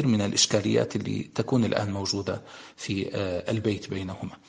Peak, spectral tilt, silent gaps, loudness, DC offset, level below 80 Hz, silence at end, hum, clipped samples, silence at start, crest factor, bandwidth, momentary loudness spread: -6 dBFS; -4.5 dB/octave; none; -27 LUFS; under 0.1%; -60 dBFS; 0.15 s; none; under 0.1%; 0 s; 20 dB; 10 kHz; 12 LU